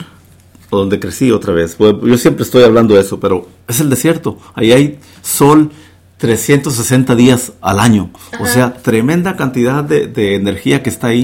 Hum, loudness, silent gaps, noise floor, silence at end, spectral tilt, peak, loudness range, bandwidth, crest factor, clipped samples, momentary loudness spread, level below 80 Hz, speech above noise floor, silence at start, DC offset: none; -11 LUFS; none; -42 dBFS; 0 s; -5.5 dB/octave; 0 dBFS; 2 LU; 17 kHz; 12 dB; 0.3%; 9 LU; -42 dBFS; 31 dB; 0 s; under 0.1%